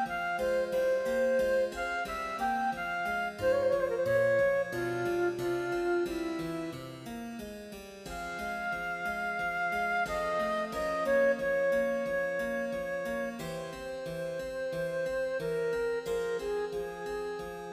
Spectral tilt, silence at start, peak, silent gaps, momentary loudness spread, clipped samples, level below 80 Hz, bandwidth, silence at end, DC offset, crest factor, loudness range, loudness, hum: -5 dB/octave; 0 s; -18 dBFS; none; 11 LU; under 0.1%; -58 dBFS; 15.5 kHz; 0 s; under 0.1%; 14 dB; 6 LU; -32 LUFS; none